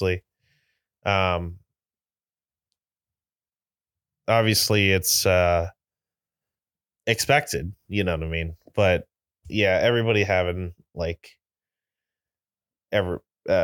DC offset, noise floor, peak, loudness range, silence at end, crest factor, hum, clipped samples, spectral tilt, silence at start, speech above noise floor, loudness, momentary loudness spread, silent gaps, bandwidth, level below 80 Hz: under 0.1%; under -90 dBFS; -4 dBFS; 8 LU; 0 s; 22 dB; none; under 0.1%; -4 dB/octave; 0 s; over 68 dB; -23 LUFS; 13 LU; none; 19 kHz; -46 dBFS